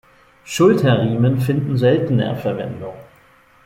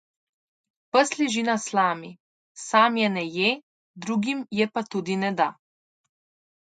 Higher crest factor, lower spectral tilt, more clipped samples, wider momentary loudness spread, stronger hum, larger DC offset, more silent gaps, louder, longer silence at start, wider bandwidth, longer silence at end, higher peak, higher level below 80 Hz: second, 16 dB vs 24 dB; first, -7 dB/octave vs -4 dB/octave; neither; first, 14 LU vs 11 LU; neither; neither; second, none vs 2.20-2.55 s, 3.63-3.94 s; first, -17 LUFS vs -24 LUFS; second, 0.45 s vs 0.95 s; first, 15.5 kHz vs 9.4 kHz; second, 0.6 s vs 1.2 s; about the same, -2 dBFS vs -2 dBFS; first, -52 dBFS vs -74 dBFS